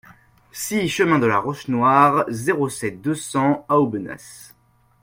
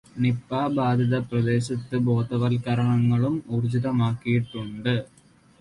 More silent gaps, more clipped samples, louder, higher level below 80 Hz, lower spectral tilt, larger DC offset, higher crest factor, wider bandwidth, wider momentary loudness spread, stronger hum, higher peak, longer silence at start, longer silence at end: neither; neither; first, -20 LUFS vs -24 LUFS; about the same, -58 dBFS vs -56 dBFS; second, -5.5 dB/octave vs -8 dB/octave; neither; first, 20 dB vs 12 dB; first, 16.5 kHz vs 11 kHz; first, 15 LU vs 5 LU; neither; first, -2 dBFS vs -10 dBFS; first, 0.55 s vs 0.15 s; about the same, 0.55 s vs 0.55 s